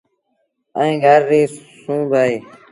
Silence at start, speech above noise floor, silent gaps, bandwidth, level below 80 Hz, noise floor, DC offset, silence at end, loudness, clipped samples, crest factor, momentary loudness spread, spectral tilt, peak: 0.75 s; 53 dB; none; 11.5 kHz; -64 dBFS; -68 dBFS; under 0.1%; 0.3 s; -16 LUFS; under 0.1%; 16 dB; 15 LU; -6 dB/octave; 0 dBFS